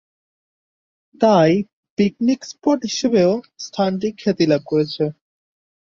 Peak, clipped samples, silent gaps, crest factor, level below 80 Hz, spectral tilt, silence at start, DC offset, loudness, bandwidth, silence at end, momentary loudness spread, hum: -2 dBFS; under 0.1%; 1.73-1.83 s, 1.90-1.97 s; 18 dB; -60 dBFS; -6 dB/octave; 1.2 s; under 0.1%; -19 LUFS; 7.6 kHz; 0.8 s; 9 LU; none